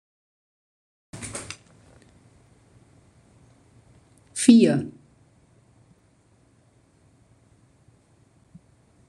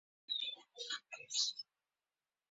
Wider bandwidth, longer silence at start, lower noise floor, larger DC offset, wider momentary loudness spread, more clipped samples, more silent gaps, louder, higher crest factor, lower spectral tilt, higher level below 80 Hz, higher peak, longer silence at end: first, 12 kHz vs 8 kHz; first, 1.15 s vs 0.3 s; second, -61 dBFS vs under -90 dBFS; neither; first, 25 LU vs 13 LU; neither; neither; first, -20 LUFS vs -40 LUFS; about the same, 26 dB vs 26 dB; first, -5 dB/octave vs 4.5 dB/octave; first, -64 dBFS vs under -90 dBFS; first, -2 dBFS vs -20 dBFS; first, 4.2 s vs 0.9 s